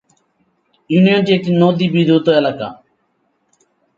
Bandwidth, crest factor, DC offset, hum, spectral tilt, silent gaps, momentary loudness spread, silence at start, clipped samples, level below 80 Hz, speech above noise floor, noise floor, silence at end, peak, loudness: 7.4 kHz; 16 dB; under 0.1%; none; -8 dB/octave; none; 9 LU; 0.9 s; under 0.1%; -60 dBFS; 51 dB; -64 dBFS; 1.25 s; 0 dBFS; -13 LUFS